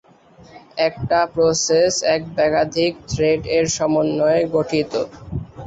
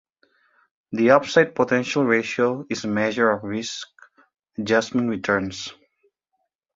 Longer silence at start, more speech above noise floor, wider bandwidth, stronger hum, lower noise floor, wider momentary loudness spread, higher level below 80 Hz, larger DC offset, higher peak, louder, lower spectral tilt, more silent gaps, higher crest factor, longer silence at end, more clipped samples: second, 0.55 s vs 0.9 s; second, 29 dB vs 55 dB; about the same, 8 kHz vs 7.8 kHz; neither; second, -47 dBFS vs -76 dBFS; second, 8 LU vs 15 LU; first, -44 dBFS vs -60 dBFS; neither; second, -6 dBFS vs 0 dBFS; about the same, -19 LUFS vs -21 LUFS; about the same, -4 dB/octave vs -5 dB/octave; neither; second, 14 dB vs 22 dB; second, 0 s vs 1.05 s; neither